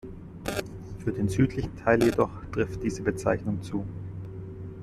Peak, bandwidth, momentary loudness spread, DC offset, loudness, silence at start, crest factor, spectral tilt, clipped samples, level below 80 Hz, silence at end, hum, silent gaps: -8 dBFS; 14.5 kHz; 16 LU; under 0.1%; -28 LUFS; 0.05 s; 20 dB; -7 dB/octave; under 0.1%; -46 dBFS; 0 s; none; none